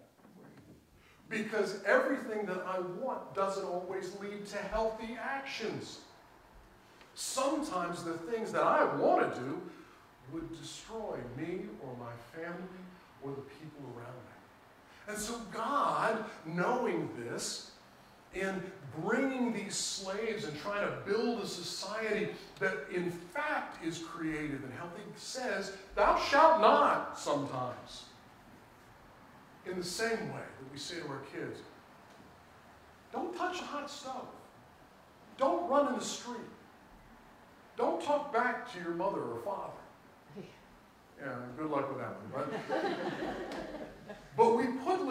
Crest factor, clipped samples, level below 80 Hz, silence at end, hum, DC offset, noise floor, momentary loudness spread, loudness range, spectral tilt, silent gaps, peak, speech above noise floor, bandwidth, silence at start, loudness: 26 dB; under 0.1%; -64 dBFS; 0 s; none; under 0.1%; -62 dBFS; 18 LU; 13 LU; -4 dB/octave; none; -10 dBFS; 27 dB; 16 kHz; 0 s; -35 LUFS